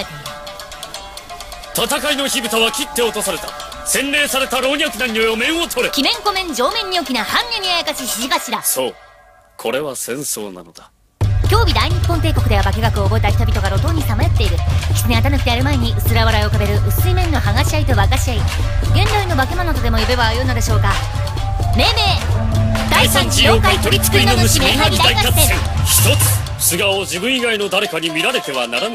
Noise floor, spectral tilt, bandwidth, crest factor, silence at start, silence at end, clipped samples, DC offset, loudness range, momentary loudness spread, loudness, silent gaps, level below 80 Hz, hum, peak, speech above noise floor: -47 dBFS; -4 dB/octave; 16 kHz; 16 dB; 0 s; 0 s; under 0.1%; under 0.1%; 6 LU; 9 LU; -15 LUFS; none; -22 dBFS; none; 0 dBFS; 32 dB